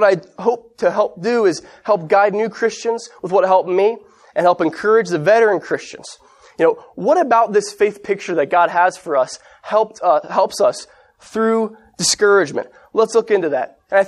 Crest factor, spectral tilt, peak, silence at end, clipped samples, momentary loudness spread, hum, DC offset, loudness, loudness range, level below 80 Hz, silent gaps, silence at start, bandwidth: 16 dB; -3.5 dB/octave; -2 dBFS; 0 s; under 0.1%; 11 LU; none; under 0.1%; -17 LUFS; 2 LU; -64 dBFS; none; 0 s; 12.5 kHz